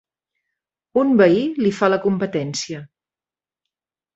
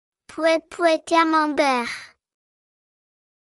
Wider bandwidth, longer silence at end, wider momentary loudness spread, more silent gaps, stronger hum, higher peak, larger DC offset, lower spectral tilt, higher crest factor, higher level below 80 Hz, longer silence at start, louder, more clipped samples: second, 8.2 kHz vs 12 kHz; about the same, 1.3 s vs 1.35 s; about the same, 12 LU vs 13 LU; neither; neither; first, -2 dBFS vs -6 dBFS; neither; first, -5.5 dB/octave vs -2.5 dB/octave; about the same, 18 dB vs 18 dB; about the same, -62 dBFS vs -66 dBFS; first, 0.95 s vs 0.3 s; about the same, -18 LUFS vs -20 LUFS; neither